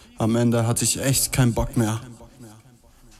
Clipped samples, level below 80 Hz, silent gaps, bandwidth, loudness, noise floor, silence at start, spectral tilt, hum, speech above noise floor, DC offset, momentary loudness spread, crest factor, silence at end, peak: under 0.1%; -40 dBFS; none; 16 kHz; -21 LUFS; -51 dBFS; 0.2 s; -4.5 dB/octave; none; 30 dB; under 0.1%; 5 LU; 18 dB; 0.65 s; -6 dBFS